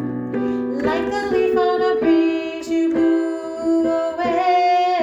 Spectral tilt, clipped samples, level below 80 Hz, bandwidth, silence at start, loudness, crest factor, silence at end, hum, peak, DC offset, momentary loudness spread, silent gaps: -6 dB/octave; under 0.1%; -52 dBFS; 8 kHz; 0 s; -19 LUFS; 12 dB; 0 s; none; -6 dBFS; under 0.1%; 7 LU; none